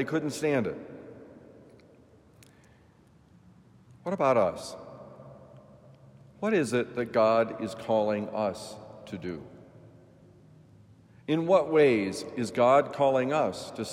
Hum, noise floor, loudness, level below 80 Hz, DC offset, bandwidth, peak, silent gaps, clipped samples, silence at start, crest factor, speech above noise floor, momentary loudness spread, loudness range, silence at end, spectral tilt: none; -59 dBFS; -27 LUFS; -70 dBFS; under 0.1%; 15 kHz; -10 dBFS; none; under 0.1%; 0 s; 20 dB; 32 dB; 23 LU; 11 LU; 0 s; -6 dB/octave